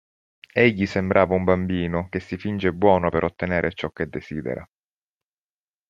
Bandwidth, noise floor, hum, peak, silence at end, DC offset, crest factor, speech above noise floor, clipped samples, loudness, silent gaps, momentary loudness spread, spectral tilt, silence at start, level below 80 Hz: 7.4 kHz; under -90 dBFS; none; -2 dBFS; 1.25 s; under 0.1%; 22 dB; over 68 dB; under 0.1%; -23 LUFS; none; 11 LU; -8 dB/octave; 0.55 s; -52 dBFS